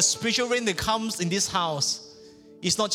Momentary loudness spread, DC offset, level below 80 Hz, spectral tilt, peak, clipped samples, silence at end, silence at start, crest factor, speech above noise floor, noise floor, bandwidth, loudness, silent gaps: 3 LU; under 0.1%; -54 dBFS; -2 dB/octave; -8 dBFS; under 0.1%; 0 s; 0 s; 18 dB; 24 dB; -49 dBFS; 18 kHz; -25 LUFS; none